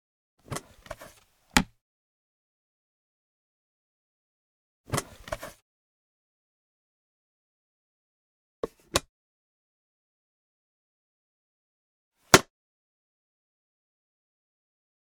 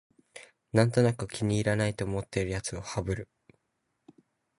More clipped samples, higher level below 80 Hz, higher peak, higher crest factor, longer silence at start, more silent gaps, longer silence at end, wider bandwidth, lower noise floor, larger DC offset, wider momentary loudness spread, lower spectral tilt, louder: neither; about the same, -52 dBFS vs -52 dBFS; first, 0 dBFS vs -8 dBFS; first, 36 dB vs 22 dB; first, 0.5 s vs 0.35 s; first, 1.81-4.84 s, 5.62-8.63 s, 9.09-12.12 s vs none; first, 2.7 s vs 1.35 s; first, 19.5 kHz vs 11.5 kHz; second, -57 dBFS vs -79 dBFS; neither; about the same, 25 LU vs 23 LU; second, -2.5 dB/octave vs -6 dB/octave; first, -25 LUFS vs -29 LUFS